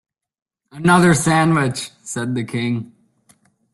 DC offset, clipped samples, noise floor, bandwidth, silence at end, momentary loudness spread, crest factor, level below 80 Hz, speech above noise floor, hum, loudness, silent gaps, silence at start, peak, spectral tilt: under 0.1%; under 0.1%; -57 dBFS; 12.5 kHz; 0.9 s; 14 LU; 18 dB; -54 dBFS; 40 dB; none; -18 LUFS; none; 0.75 s; -2 dBFS; -5.5 dB/octave